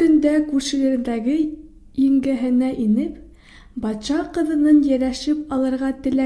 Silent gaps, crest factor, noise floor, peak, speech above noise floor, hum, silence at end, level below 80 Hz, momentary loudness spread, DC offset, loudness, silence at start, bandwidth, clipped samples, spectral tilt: none; 14 dB; -45 dBFS; -6 dBFS; 26 dB; none; 0 s; -46 dBFS; 11 LU; under 0.1%; -20 LUFS; 0 s; 11 kHz; under 0.1%; -5.5 dB/octave